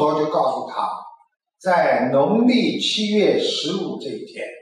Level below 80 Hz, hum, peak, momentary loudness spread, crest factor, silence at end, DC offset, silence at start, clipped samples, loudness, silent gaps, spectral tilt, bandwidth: -70 dBFS; none; -8 dBFS; 14 LU; 12 dB; 0 s; under 0.1%; 0 s; under 0.1%; -19 LUFS; none; -5 dB/octave; 11 kHz